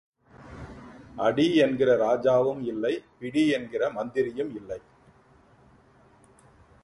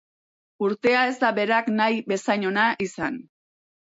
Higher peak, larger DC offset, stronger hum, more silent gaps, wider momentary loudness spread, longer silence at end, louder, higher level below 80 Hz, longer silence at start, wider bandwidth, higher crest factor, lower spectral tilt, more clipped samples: about the same, -10 dBFS vs -8 dBFS; neither; neither; neither; first, 22 LU vs 8 LU; first, 2.05 s vs 0.75 s; about the same, -25 LUFS vs -23 LUFS; first, -60 dBFS vs -66 dBFS; second, 0.4 s vs 0.6 s; first, 11.5 kHz vs 8 kHz; about the same, 18 dB vs 16 dB; first, -6 dB/octave vs -4.5 dB/octave; neither